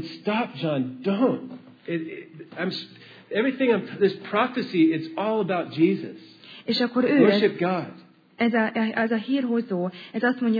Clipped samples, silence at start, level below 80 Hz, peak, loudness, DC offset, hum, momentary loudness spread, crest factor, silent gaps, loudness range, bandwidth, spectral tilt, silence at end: under 0.1%; 0 s; -84 dBFS; -6 dBFS; -24 LUFS; under 0.1%; none; 16 LU; 20 dB; none; 5 LU; 5 kHz; -8 dB/octave; 0 s